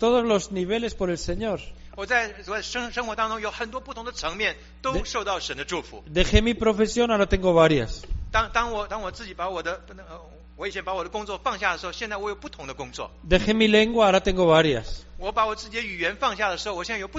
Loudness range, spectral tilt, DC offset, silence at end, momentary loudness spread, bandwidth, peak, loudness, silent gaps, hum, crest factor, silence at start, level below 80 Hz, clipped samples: 9 LU; -3 dB/octave; under 0.1%; 0 s; 16 LU; 8 kHz; -2 dBFS; -24 LUFS; none; none; 24 dB; 0 s; -36 dBFS; under 0.1%